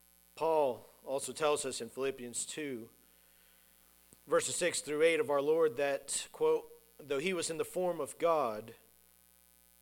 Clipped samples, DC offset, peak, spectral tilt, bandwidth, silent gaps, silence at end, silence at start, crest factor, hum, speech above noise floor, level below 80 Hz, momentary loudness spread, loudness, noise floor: under 0.1%; under 0.1%; -16 dBFS; -3 dB/octave; 18.5 kHz; none; 1.1 s; 0.35 s; 20 dB; none; 31 dB; -74 dBFS; 9 LU; -34 LUFS; -65 dBFS